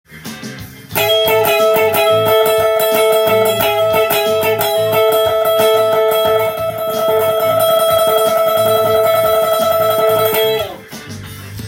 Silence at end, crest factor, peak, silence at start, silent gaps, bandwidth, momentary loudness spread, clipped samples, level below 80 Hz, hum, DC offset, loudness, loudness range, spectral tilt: 0 s; 12 dB; 0 dBFS; 0.1 s; none; 17 kHz; 15 LU; under 0.1%; -50 dBFS; none; under 0.1%; -13 LUFS; 1 LU; -3 dB/octave